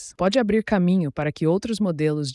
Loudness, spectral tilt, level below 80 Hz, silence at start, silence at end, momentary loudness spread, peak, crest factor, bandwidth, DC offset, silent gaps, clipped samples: -22 LUFS; -6.5 dB/octave; -50 dBFS; 0 s; 0 s; 4 LU; -8 dBFS; 12 dB; 11.5 kHz; under 0.1%; none; under 0.1%